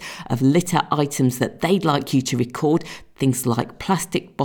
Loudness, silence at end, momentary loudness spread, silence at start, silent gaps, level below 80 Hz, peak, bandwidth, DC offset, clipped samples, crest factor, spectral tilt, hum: -21 LUFS; 0 s; 5 LU; 0 s; none; -52 dBFS; -4 dBFS; over 20 kHz; under 0.1%; under 0.1%; 18 dB; -5.5 dB/octave; none